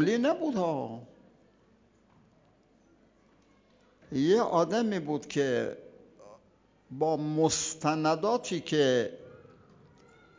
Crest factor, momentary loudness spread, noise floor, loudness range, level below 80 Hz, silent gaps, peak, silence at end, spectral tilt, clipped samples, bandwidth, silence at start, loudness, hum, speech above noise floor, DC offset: 20 dB; 12 LU; -64 dBFS; 8 LU; -68 dBFS; none; -12 dBFS; 1 s; -4.5 dB/octave; under 0.1%; 7.8 kHz; 0 s; -29 LUFS; none; 36 dB; under 0.1%